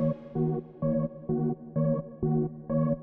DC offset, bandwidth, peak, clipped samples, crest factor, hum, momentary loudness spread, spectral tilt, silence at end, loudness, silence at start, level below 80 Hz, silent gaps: under 0.1%; 2.4 kHz; -16 dBFS; under 0.1%; 14 dB; none; 2 LU; -12.5 dB/octave; 0 s; -30 LUFS; 0 s; -52 dBFS; none